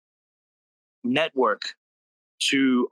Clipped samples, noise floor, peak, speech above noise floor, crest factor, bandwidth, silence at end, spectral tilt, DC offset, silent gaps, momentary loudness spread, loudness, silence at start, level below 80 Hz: under 0.1%; under -90 dBFS; -8 dBFS; over 67 dB; 18 dB; 12.5 kHz; 0.05 s; -3 dB/octave; under 0.1%; 1.78-2.38 s; 12 LU; -24 LUFS; 1.05 s; -78 dBFS